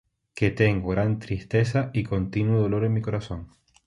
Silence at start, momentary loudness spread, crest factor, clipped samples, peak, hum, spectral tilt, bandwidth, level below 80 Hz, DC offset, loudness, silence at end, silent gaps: 0.35 s; 9 LU; 20 dB; under 0.1%; -6 dBFS; none; -8 dB/octave; 11 kHz; -44 dBFS; under 0.1%; -25 LUFS; 0.4 s; none